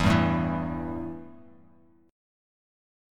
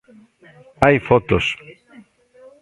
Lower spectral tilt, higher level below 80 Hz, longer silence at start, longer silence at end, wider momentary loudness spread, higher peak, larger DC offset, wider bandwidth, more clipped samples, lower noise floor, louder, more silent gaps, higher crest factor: about the same, -7 dB/octave vs -6.5 dB/octave; about the same, -44 dBFS vs -42 dBFS; second, 0 s vs 0.8 s; about the same, 0.95 s vs 0.9 s; first, 20 LU vs 8 LU; second, -10 dBFS vs 0 dBFS; neither; first, 13 kHz vs 11.5 kHz; neither; first, -59 dBFS vs -48 dBFS; second, -28 LUFS vs -17 LUFS; neither; about the same, 20 dB vs 20 dB